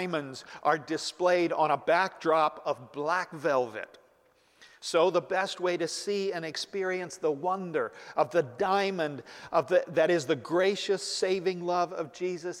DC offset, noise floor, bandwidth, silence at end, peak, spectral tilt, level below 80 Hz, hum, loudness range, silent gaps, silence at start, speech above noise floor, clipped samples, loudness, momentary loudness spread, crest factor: under 0.1%; -65 dBFS; 14 kHz; 0 s; -12 dBFS; -4 dB/octave; -76 dBFS; none; 3 LU; none; 0 s; 36 dB; under 0.1%; -29 LUFS; 8 LU; 18 dB